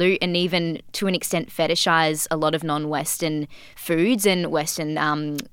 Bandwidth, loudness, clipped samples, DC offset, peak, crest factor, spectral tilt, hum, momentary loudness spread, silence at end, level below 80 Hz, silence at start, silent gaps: 19 kHz; -22 LUFS; under 0.1%; under 0.1%; -4 dBFS; 18 dB; -4 dB/octave; none; 8 LU; 0.05 s; -58 dBFS; 0 s; none